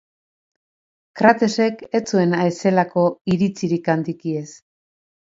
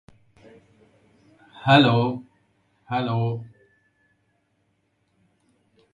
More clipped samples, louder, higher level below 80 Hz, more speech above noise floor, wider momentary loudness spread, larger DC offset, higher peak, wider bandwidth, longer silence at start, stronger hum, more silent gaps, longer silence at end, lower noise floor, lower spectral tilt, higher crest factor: neither; about the same, -19 LUFS vs -21 LUFS; about the same, -62 dBFS vs -62 dBFS; first, over 71 dB vs 50 dB; second, 10 LU vs 16 LU; neither; first, 0 dBFS vs -4 dBFS; second, 7.8 kHz vs 10 kHz; second, 1.15 s vs 1.55 s; neither; first, 3.21-3.25 s vs none; second, 0.65 s vs 2.45 s; first, under -90 dBFS vs -70 dBFS; about the same, -6.5 dB/octave vs -7.5 dB/octave; about the same, 20 dB vs 24 dB